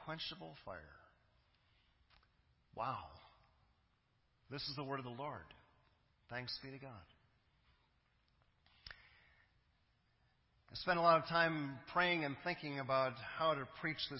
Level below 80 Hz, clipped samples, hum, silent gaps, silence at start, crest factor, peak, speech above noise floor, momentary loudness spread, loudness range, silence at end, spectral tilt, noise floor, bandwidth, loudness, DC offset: -72 dBFS; under 0.1%; none; none; 0 s; 24 dB; -18 dBFS; 38 dB; 23 LU; 16 LU; 0 s; -2.5 dB/octave; -78 dBFS; 5.6 kHz; -39 LUFS; under 0.1%